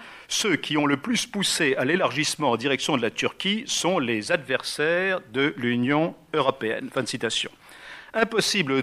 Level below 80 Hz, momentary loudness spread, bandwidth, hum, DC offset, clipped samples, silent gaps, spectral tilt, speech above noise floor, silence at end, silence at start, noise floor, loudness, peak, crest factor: -64 dBFS; 6 LU; 15.5 kHz; none; under 0.1%; under 0.1%; none; -3.5 dB/octave; 20 dB; 0 s; 0 s; -44 dBFS; -24 LUFS; -4 dBFS; 22 dB